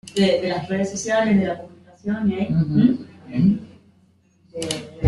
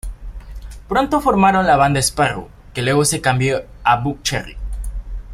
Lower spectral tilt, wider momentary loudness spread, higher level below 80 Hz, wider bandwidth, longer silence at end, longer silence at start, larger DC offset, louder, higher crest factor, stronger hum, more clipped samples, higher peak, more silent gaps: first, -6 dB/octave vs -4.5 dB/octave; second, 11 LU vs 20 LU; second, -54 dBFS vs -32 dBFS; second, 12 kHz vs 16 kHz; about the same, 0 s vs 0 s; about the same, 0.05 s vs 0.05 s; neither; second, -21 LUFS vs -17 LUFS; about the same, 18 dB vs 18 dB; neither; neither; second, -4 dBFS vs 0 dBFS; neither